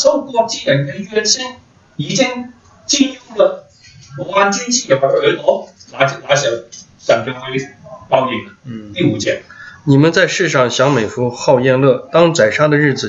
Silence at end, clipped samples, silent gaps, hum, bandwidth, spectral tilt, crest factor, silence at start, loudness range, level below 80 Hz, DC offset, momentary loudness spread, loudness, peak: 0 s; under 0.1%; none; none; 8 kHz; -4 dB/octave; 14 dB; 0 s; 5 LU; -56 dBFS; under 0.1%; 16 LU; -14 LUFS; 0 dBFS